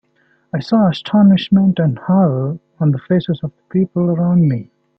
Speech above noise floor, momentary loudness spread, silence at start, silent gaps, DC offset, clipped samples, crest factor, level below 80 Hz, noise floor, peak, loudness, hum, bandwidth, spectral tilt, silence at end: 44 dB; 12 LU; 0.55 s; none; under 0.1%; under 0.1%; 12 dB; -54 dBFS; -59 dBFS; -2 dBFS; -15 LUFS; none; 6 kHz; -9.5 dB/octave; 0.35 s